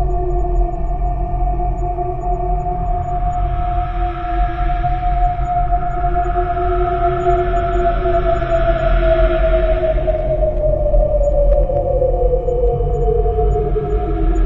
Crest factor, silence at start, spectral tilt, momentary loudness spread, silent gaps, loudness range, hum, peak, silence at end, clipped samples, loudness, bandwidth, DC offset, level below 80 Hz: 14 dB; 0 s; -9 dB/octave; 5 LU; none; 5 LU; none; -2 dBFS; 0 s; under 0.1%; -18 LUFS; 4.1 kHz; under 0.1%; -18 dBFS